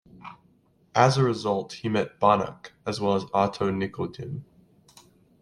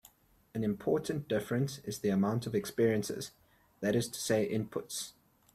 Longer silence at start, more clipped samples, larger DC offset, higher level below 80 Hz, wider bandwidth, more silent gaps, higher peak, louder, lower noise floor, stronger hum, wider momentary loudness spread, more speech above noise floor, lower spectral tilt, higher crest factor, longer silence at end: second, 0.25 s vs 0.55 s; neither; neither; about the same, -62 dBFS vs -66 dBFS; second, 11.5 kHz vs 16 kHz; neither; first, -4 dBFS vs -16 dBFS; first, -25 LUFS vs -34 LUFS; about the same, -62 dBFS vs -63 dBFS; neither; first, 16 LU vs 9 LU; first, 37 dB vs 30 dB; about the same, -6 dB/octave vs -5.5 dB/octave; first, 24 dB vs 18 dB; first, 1 s vs 0.45 s